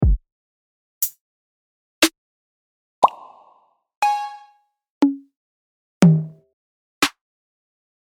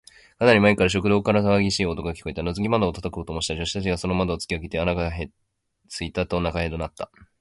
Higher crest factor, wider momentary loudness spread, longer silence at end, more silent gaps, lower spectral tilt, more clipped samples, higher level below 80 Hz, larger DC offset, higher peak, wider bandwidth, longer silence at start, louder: about the same, 24 dB vs 20 dB; second, 11 LU vs 14 LU; first, 0.95 s vs 0.15 s; first, 0.32-1.01 s, 1.21-2.02 s, 2.18-3.02 s, 3.97-4.02 s, 4.90-5.01 s, 5.37-6.01 s, 6.53-7.01 s vs none; about the same, -5 dB/octave vs -5.5 dB/octave; neither; first, -32 dBFS vs -40 dBFS; neither; first, 0 dBFS vs -4 dBFS; first, over 20 kHz vs 11.5 kHz; second, 0 s vs 0.4 s; first, -20 LUFS vs -23 LUFS